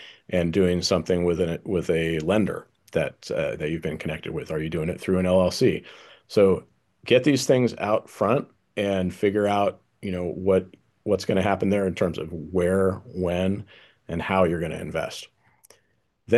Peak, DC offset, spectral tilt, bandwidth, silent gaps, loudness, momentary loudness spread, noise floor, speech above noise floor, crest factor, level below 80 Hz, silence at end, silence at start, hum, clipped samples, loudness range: -6 dBFS; under 0.1%; -6 dB/octave; 12.5 kHz; none; -24 LUFS; 10 LU; -70 dBFS; 46 dB; 20 dB; -46 dBFS; 0 s; 0 s; none; under 0.1%; 4 LU